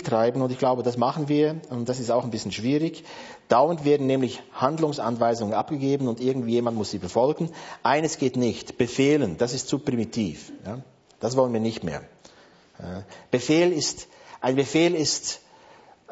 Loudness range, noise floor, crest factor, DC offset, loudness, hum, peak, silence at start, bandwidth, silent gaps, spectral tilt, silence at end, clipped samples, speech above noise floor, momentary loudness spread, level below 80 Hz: 4 LU; -54 dBFS; 20 dB; under 0.1%; -24 LUFS; none; -6 dBFS; 0 s; 8 kHz; none; -5 dB/octave; 0 s; under 0.1%; 30 dB; 16 LU; -60 dBFS